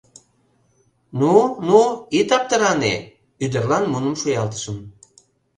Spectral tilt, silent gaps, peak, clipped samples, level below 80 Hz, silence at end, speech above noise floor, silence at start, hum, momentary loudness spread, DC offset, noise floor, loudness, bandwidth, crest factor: -5 dB/octave; none; 0 dBFS; under 0.1%; -56 dBFS; 0.7 s; 43 dB; 1.15 s; none; 13 LU; under 0.1%; -62 dBFS; -19 LUFS; 10 kHz; 20 dB